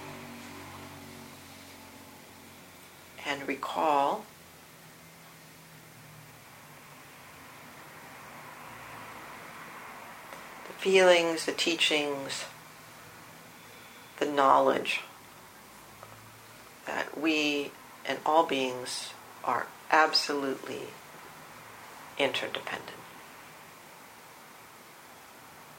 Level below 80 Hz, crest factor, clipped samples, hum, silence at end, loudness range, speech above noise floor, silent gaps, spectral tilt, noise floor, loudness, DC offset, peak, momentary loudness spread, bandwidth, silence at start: -74 dBFS; 26 dB; under 0.1%; none; 0 s; 19 LU; 25 dB; none; -2.5 dB/octave; -52 dBFS; -28 LUFS; under 0.1%; -6 dBFS; 25 LU; 16.5 kHz; 0 s